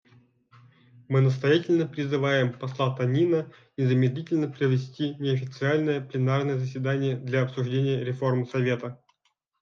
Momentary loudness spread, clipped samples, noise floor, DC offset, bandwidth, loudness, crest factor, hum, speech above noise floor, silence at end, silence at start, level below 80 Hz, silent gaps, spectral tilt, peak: 6 LU; under 0.1%; -74 dBFS; under 0.1%; 6.8 kHz; -26 LUFS; 16 dB; none; 49 dB; 0.65 s; 1.1 s; -72 dBFS; none; -8 dB/octave; -10 dBFS